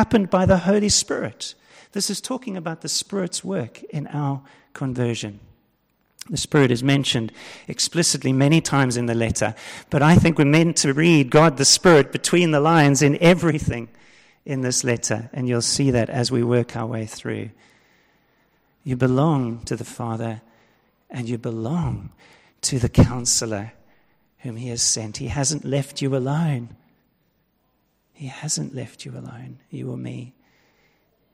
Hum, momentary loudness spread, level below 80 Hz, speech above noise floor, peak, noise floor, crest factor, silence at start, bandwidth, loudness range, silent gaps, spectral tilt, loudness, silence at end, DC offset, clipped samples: none; 18 LU; -44 dBFS; 47 dB; -4 dBFS; -67 dBFS; 18 dB; 0 s; 16 kHz; 13 LU; none; -4.5 dB/octave; -20 LUFS; 1.05 s; under 0.1%; under 0.1%